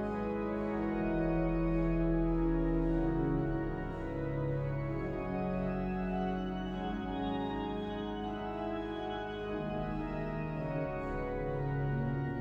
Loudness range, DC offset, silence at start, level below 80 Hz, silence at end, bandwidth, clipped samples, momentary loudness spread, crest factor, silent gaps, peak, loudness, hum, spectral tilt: 5 LU; under 0.1%; 0 s; -42 dBFS; 0 s; 6.2 kHz; under 0.1%; 6 LU; 14 dB; none; -20 dBFS; -35 LUFS; none; -9.5 dB/octave